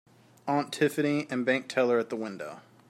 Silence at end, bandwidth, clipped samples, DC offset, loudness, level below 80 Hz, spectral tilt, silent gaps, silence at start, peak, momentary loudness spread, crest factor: 0.3 s; 16 kHz; under 0.1%; under 0.1%; -29 LUFS; -78 dBFS; -5.5 dB/octave; none; 0.45 s; -12 dBFS; 14 LU; 18 dB